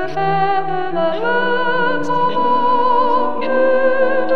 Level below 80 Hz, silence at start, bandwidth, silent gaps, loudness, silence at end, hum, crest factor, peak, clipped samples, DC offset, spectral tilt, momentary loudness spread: -62 dBFS; 0 s; 7 kHz; none; -16 LUFS; 0 s; none; 12 dB; -4 dBFS; under 0.1%; 9%; -6.5 dB/octave; 4 LU